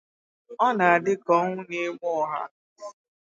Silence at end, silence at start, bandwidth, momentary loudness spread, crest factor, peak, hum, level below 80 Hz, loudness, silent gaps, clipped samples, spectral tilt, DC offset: 0.3 s; 0.5 s; 7.8 kHz; 23 LU; 20 dB; -6 dBFS; none; -80 dBFS; -24 LUFS; 2.51-2.76 s; under 0.1%; -6 dB/octave; under 0.1%